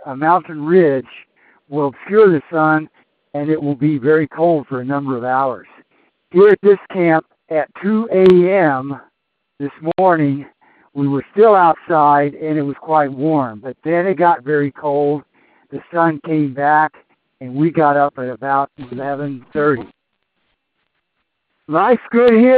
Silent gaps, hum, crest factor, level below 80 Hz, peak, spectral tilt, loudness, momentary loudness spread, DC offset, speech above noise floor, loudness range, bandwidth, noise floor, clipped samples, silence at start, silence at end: none; none; 16 dB; -60 dBFS; 0 dBFS; -10 dB/octave; -15 LUFS; 13 LU; under 0.1%; 57 dB; 4 LU; 4.8 kHz; -72 dBFS; under 0.1%; 0.05 s; 0 s